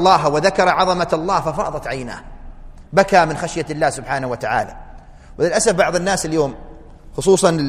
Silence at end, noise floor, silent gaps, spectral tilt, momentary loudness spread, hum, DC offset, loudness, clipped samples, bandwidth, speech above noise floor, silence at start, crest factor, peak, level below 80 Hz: 0 s; -38 dBFS; none; -4 dB/octave; 12 LU; none; under 0.1%; -18 LUFS; under 0.1%; 14.5 kHz; 21 dB; 0 s; 18 dB; 0 dBFS; -38 dBFS